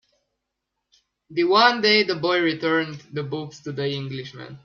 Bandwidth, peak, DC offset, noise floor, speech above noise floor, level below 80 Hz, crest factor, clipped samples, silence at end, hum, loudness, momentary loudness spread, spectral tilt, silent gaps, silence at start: 7.2 kHz; -2 dBFS; under 0.1%; -81 dBFS; 58 dB; -68 dBFS; 20 dB; under 0.1%; 0.05 s; none; -21 LUFS; 16 LU; -5 dB/octave; none; 1.3 s